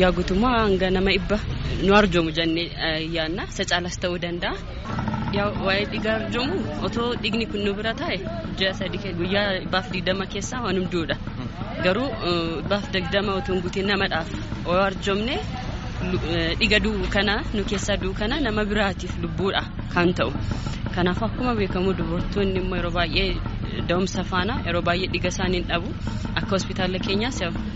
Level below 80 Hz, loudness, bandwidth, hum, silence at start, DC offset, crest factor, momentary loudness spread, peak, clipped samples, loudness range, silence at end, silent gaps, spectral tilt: -34 dBFS; -24 LUFS; 8 kHz; none; 0 s; under 0.1%; 20 dB; 7 LU; -4 dBFS; under 0.1%; 3 LU; 0 s; none; -4 dB/octave